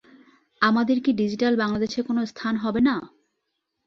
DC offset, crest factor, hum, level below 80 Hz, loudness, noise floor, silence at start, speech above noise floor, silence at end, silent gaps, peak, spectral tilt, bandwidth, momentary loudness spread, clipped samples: under 0.1%; 20 dB; none; -58 dBFS; -23 LUFS; -78 dBFS; 0.6 s; 56 dB; 0.8 s; none; -6 dBFS; -6 dB/octave; 7 kHz; 6 LU; under 0.1%